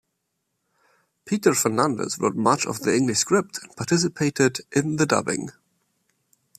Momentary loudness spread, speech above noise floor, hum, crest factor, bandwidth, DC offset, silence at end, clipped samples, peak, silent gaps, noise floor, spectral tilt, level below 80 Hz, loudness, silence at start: 9 LU; 54 dB; none; 20 dB; 15 kHz; under 0.1%; 1.1 s; under 0.1%; -4 dBFS; none; -77 dBFS; -4 dB/octave; -64 dBFS; -22 LUFS; 1.25 s